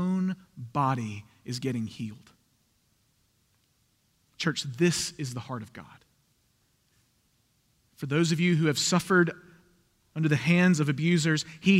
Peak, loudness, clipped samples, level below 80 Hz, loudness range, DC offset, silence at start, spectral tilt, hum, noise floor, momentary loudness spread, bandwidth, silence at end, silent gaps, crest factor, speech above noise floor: -10 dBFS; -27 LUFS; under 0.1%; -68 dBFS; 12 LU; under 0.1%; 0 s; -5 dB/octave; none; -70 dBFS; 17 LU; 15 kHz; 0 s; none; 18 dB; 44 dB